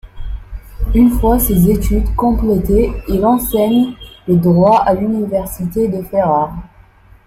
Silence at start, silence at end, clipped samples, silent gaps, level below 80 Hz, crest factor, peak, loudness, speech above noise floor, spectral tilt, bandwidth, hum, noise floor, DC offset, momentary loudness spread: 0.05 s; 0.6 s; under 0.1%; none; -22 dBFS; 12 dB; -2 dBFS; -14 LUFS; 31 dB; -7.5 dB/octave; 16.5 kHz; none; -44 dBFS; under 0.1%; 16 LU